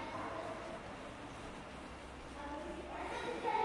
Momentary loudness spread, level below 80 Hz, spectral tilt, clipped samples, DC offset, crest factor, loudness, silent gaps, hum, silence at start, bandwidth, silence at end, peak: 8 LU; -58 dBFS; -4.5 dB/octave; under 0.1%; under 0.1%; 20 dB; -45 LUFS; none; none; 0 s; 11.5 kHz; 0 s; -24 dBFS